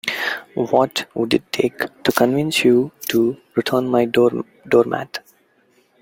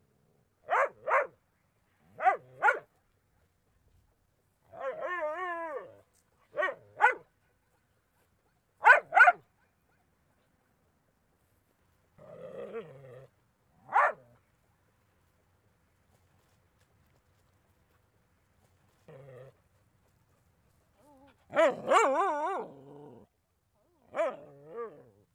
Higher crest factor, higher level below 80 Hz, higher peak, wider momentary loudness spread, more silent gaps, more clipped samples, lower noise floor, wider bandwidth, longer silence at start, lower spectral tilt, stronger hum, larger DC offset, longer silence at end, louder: second, 18 dB vs 26 dB; first, -58 dBFS vs -78 dBFS; first, -2 dBFS vs -8 dBFS; second, 7 LU vs 24 LU; neither; neither; second, -59 dBFS vs -75 dBFS; first, 17 kHz vs 13.5 kHz; second, 0.05 s vs 0.7 s; first, -5 dB/octave vs -3 dB/octave; neither; neither; first, 0.85 s vs 0.45 s; first, -19 LUFS vs -28 LUFS